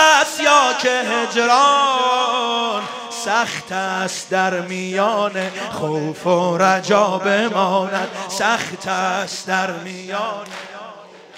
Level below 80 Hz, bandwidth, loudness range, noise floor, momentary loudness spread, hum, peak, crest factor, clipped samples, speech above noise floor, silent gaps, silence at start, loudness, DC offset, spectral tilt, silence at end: -68 dBFS; 16 kHz; 5 LU; -39 dBFS; 12 LU; none; 0 dBFS; 18 dB; under 0.1%; 21 dB; none; 0 s; -18 LUFS; under 0.1%; -3 dB/octave; 0 s